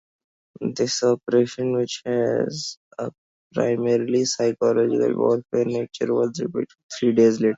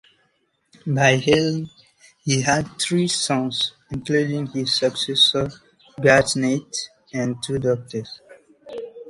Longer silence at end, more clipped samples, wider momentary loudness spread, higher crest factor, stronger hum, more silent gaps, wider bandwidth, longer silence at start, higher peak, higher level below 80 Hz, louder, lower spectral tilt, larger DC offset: about the same, 0 s vs 0 s; neither; second, 12 LU vs 16 LU; about the same, 16 dB vs 20 dB; neither; first, 2.77-2.91 s, 3.18-3.51 s, 6.83-6.89 s vs none; second, 7.8 kHz vs 11.5 kHz; second, 0.6 s vs 0.85 s; second, -6 dBFS vs -2 dBFS; second, -66 dBFS vs -54 dBFS; about the same, -22 LUFS vs -20 LUFS; about the same, -5 dB/octave vs -4 dB/octave; neither